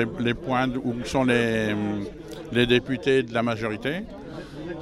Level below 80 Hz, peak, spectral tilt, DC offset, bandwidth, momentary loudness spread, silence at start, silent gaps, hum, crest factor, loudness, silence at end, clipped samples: -48 dBFS; -6 dBFS; -6 dB/octave; under 0.1%; 13 kHz; 15 LU; 0 s; none; none; 18 dB; -24 LUFS; 0 s; under 0.1%